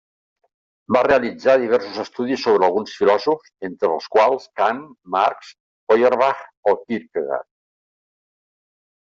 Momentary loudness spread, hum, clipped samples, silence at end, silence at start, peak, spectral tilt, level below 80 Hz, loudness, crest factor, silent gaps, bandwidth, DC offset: 10 LU; none; under 0.1%; 1.7 s; 0.9 s; -2 dBFS; -5.5 dB/octave; -60 dBFS; -19 LUFS; 18 dB; 5.60-5.87 s, 6.57-6.63 s; 7.4 kHz; under 0.1%